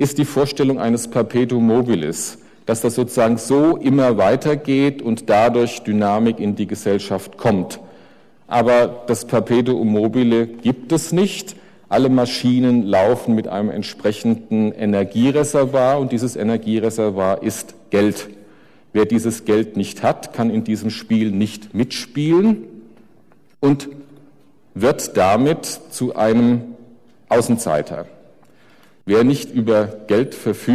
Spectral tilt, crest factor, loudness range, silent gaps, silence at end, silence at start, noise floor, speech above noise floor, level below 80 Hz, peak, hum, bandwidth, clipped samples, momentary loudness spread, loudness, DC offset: -6 dB/octave; 10 dB; 4 LU; none; 0 s; 0 s; -54 dBFS; 37 dB; -54 dBFS; -8 dBFS; none; 14.5 kHz; under 0.1%; 8 LU; -18 LUFS; 0.3%